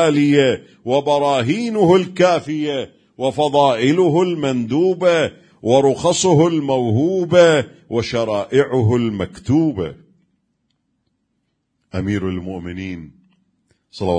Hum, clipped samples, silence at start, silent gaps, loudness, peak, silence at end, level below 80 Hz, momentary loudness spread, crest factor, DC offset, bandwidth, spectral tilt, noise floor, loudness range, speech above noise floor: none; under 0.1%; 0 s; none; -17 LUFS; 0 dBFS; 0 s; -52 dBFS; 13 LU; 18 dB; under 0.1%; 10 kHz; -6 dB/octave; -70 dBFS; 13 LU; 54 dB